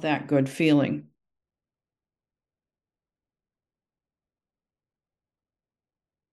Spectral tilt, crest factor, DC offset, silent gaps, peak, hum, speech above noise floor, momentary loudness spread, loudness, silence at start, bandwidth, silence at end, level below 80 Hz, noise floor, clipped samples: -7 dB/octave; 22 dB; under 0.1%; none; -10 dBFS; none; over 67 dB; 8 LU; -24 LUFS; 0 s; 12 kHz; 5.3 s; -76 dBFS; under -90 dBFS; under 0.1%